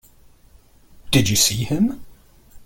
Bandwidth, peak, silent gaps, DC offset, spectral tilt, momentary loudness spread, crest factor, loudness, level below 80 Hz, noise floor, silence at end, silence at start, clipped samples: 17 kHz; -2 dBFS; none; under 0.1%; -3.5 dB/octave; 7 LU; 20 dB; -18 LUFS; -44 dBFS; -51 dBFS; 0 s; 1.05 s; under 0.1%